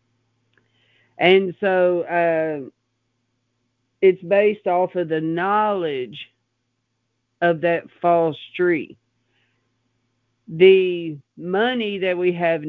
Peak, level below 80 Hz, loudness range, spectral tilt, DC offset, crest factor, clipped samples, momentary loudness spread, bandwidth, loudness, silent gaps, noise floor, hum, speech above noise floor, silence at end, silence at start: 0 dBFS; -70 dBFS; 3 LU; -8.5 dB/octave; under 0.1%; 20 dB; under 0.1%; 13 LU; 4.4 kHz; -19 LUFS; none; -73 dBFS; none; 54 dB; 0 s; 1.2 s